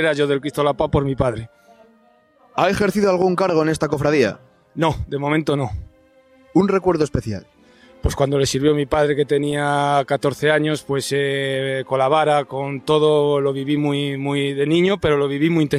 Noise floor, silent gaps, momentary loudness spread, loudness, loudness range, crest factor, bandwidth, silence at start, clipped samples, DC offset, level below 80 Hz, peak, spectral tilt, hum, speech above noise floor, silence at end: -55 dBFS; none; 7 LU; -19 LUFS; 3 LU; 18 dB; 15 kHz; 0 s; under 0.1%; under 0.1%; -40 dBFS; -2 dBFS; -6 dB/octave; none; 37 dB; 0 s